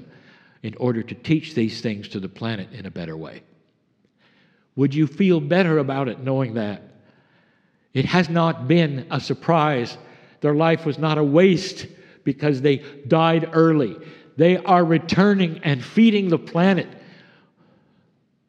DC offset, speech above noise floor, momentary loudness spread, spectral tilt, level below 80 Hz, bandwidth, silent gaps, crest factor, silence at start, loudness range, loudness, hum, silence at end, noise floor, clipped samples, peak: under 0.1%; 45 dB; 16 LU; -7.5 dB/octave; -62 dBFS; 8.4 kHz; none; 18 dB; 0 s; 8 LU; -20 LUFS; none; 1.5 s; -65 dBFS; under 0.1%; -2 dBFS